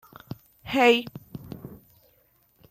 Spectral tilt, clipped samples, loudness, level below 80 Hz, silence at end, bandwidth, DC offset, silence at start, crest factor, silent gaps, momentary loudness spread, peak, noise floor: -4.5 dB/octave; under 0.1%; -22 LUFS; -60 dBFS; 0.95 s; 15 kHz; under 0.1%; 0.65 s; 22 dB; none; 23 LU; -6 dBFS; -64 dBFS